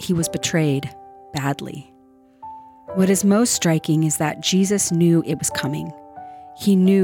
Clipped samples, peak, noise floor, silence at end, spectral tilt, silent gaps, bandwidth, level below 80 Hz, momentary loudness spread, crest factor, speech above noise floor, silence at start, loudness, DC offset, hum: under 0.1%; -6 dBFS; -52 dBFS; 0 s; -5 dB/octave; none; 18.5 kHz; -58 dBFS; 22 LU; 14 dB; 33 dB; 0 s; -19 LUFS; under 0.1%; none